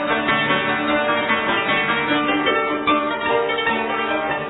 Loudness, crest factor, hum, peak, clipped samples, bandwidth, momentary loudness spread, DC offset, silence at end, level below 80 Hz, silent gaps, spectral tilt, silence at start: -19 LUFS; 14 dB; none; -6 dBFS; under 0.1%; 4.1 kHz; 2 LU; under 0.1%; 0 s; -52 dBFS; none; -7.5 dB/octave; 0 s